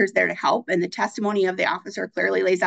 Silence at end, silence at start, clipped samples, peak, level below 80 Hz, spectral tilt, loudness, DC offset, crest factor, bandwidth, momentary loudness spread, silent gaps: 0 s; 0 s; under 0.1%; -6 dBFS; -76 dBFS; -5 dB/octave; -23 LUFS; under 0.1%; 16 dB; 8.6 kHz; 5 LU; none